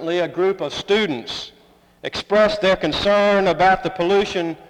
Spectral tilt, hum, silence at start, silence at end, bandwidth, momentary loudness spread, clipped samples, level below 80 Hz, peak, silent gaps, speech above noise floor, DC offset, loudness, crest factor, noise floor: -5 dB/octave; none; 0 s; 0.05 s; 11 kHz; 13 LU; under 0.1%; -46 dBFS; -4 dBFS; none; 31 dB; under 0.1%; -18 LUFS; 14 dB; -50 dBFS